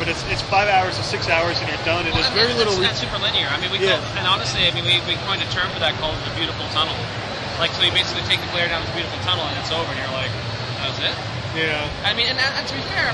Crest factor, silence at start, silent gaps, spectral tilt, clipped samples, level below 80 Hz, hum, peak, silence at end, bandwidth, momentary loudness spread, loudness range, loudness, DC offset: 18 dB; 0 s; none; -3.5 dB/octave; under 0.1%; -42 dBFS; none; -4 dBFS; 0 s; 12 kHz; 7 LU; 4 LU; -20 LUFS; under 0.1%